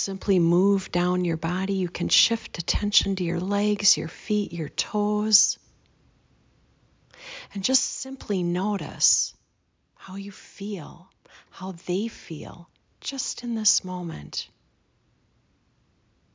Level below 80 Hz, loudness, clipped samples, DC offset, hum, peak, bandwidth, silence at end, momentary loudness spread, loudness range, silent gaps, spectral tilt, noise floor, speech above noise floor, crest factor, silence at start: -46 dBFS; -24 LUFS; under 0.1%; under 0.1%; none; -6 dBFS; 7.8 kHz; 1.9 s; 16 LU; 10 LU; none; -3.5 dB/octave; -70 dBFS; 45 dB; 22 dB; 0 s